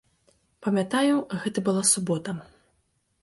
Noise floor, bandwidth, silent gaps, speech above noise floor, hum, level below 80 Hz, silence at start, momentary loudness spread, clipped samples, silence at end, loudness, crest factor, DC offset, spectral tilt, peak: -71 dBFS; 12 kHz; none; 46 dB; none; -68 dBFS; 0.6 s; 12 LU; under 0.1%; 0.8 s; -25 LUFS; 20 dB; under 0.1%; -4 dB/octave; -8 dBFS